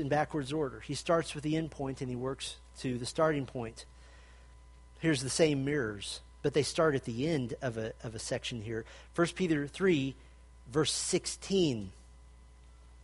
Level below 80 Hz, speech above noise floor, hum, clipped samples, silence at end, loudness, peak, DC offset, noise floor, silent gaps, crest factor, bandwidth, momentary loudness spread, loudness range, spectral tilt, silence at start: -56 dBFS; 23 dB; none; under 0.1%; 0 s; -33 LUFS; -12 dBFS; under 0.1%; -55 dBFS; none; 22 dB; 11.5 kHz; 11 LU; 4 LU; -4.5 dB/octave; 0 s